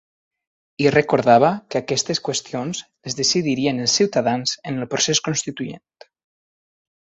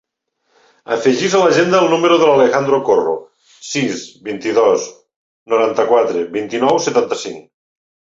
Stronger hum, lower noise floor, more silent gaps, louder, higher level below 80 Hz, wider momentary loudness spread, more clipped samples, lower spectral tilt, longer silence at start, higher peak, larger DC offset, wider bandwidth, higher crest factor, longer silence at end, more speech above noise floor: neither; first, under -90 dBFS vs -68 dBFS; second, none vs 5.16-5.46 s; second, -19 LUFS vs -15 LUFS; about the same, -60 dBFS vs -60 dBFS; about the same, 13 LU vs 13 LU; neither; about the same, -3.5 dB/octave vs -4.5 dB/octave; about the same, 0.8 s vs 0.9 s; about the same, -2 dBFS vs -2 dBFS; neither; about the same, 8.2 kHz vs 7.8 kHz; first, 20 dB vs 14 dB; first, 1.35 s vs 0.8 s; first, over 70 dB vs 54 dB